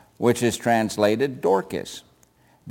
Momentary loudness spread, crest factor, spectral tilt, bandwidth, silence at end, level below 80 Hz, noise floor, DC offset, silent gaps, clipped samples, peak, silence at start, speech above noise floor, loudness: 12 LU; 18 dB; -5 dB/octave; 17 kHz; 0 s; -60 dBFS; -58 dBFS; under 0.1%; none; under 0.1%; -6 dBFS; 0.2 s; 37 dB; -22 LUFS